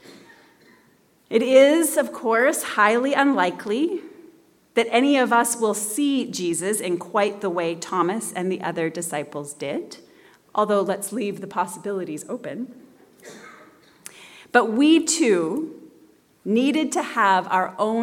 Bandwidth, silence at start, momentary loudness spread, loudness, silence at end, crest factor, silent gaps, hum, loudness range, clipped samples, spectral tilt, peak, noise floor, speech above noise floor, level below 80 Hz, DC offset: 18 kHz; 0.1 s; 14 LU; -21 LUFS; 0 s; 20 dB; none; none; 8 LU; under 0.1%; -3.5 dB/octave; -2 dBFS; -59 dBFS; 38 dB; -76 dBFS; under 0.1%